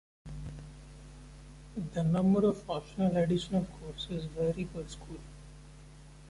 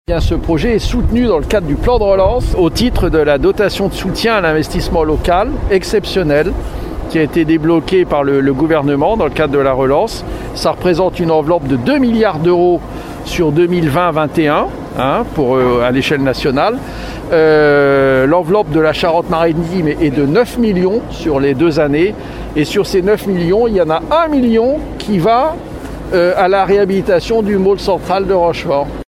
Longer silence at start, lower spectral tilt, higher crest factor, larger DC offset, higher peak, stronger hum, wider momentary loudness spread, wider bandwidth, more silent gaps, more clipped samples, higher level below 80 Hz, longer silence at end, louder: first, 0.25 s vs 0.1 s; about the same, -7.5 dB/octave vs -6.5 dB/octave; about the same, 16 dB vs 12 dB; neither; second, -18 dBFS vs 0 dBFS; neither; first, 24 LU vs 6 LU; second, 11.5 kHz vs 15.5 kHz; neither; neither; second, -52 dBFS vs -26 dBFS; about the same, 0 s vs 0.05 s; second, -32 LUFS vs -13 LUFS